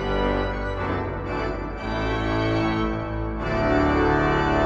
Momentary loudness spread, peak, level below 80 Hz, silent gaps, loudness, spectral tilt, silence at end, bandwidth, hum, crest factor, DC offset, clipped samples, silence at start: 8 LU; -6 dBFS; -32 dBFS; none; -24 LUFS; -7.5 dB/octave; 0 s; 7.4 kHz; none; 16 dB; under 0.1%; under 0.1%; 0 s